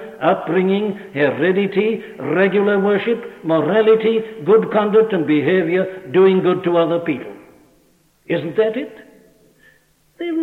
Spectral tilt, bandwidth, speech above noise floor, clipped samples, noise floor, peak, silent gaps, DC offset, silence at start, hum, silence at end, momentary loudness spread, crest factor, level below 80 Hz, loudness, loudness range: -8.5 dB/octave; 4.3 kHz; 40 dB; under 0.1%; -57 dBFS; -2 dBFS; none; under 0.1%; 0 s; none; 0 s; 10 LU; 14 dB; -64 dBFS; -17 LUFS; 7 LU